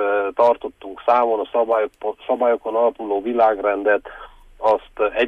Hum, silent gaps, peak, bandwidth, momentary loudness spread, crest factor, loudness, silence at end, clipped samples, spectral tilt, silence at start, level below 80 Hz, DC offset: none; none; -6 dBFS; 5.8 kHz; 8 LU; 14 dB; -20 LUFS; 0 s; under 0.1%; -5.5 dB/octave; 0 s; -52 dBFS; under 0.1%